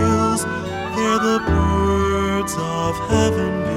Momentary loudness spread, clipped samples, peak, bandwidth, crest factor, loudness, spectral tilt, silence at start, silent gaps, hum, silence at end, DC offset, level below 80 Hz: 5 LU; under 0.1%; -4 dBFS; 15.5 kHz; 16 dB; -19 LUFS; -5.5 dB/octave; 0 s; none; none; 0 s; under 0.1%; -34 dBFS